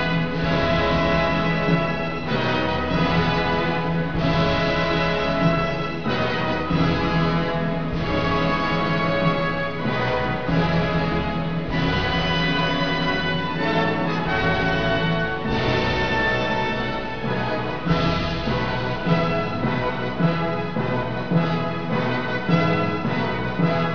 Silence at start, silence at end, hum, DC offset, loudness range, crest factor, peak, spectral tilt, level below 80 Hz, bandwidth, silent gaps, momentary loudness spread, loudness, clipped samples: 0 s; 0 s; none; 2%; 2 LU; 16 dB; -6 dBFS; -7 dB/octave; -38 dBFS; 5.4 kHz; none; 4 LU; -22 LUFS; under 0.1%